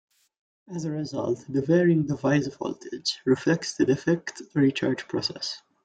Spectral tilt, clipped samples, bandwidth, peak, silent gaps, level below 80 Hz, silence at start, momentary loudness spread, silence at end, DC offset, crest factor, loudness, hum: -5.5 dB/octave; under 0.1%; 9.2 kHz; -10 dBFS; none; -64 dBFS; 0.7 s; 11 LU; 0.25 s; under 0.1%; 16 dB; -26 LUFS; none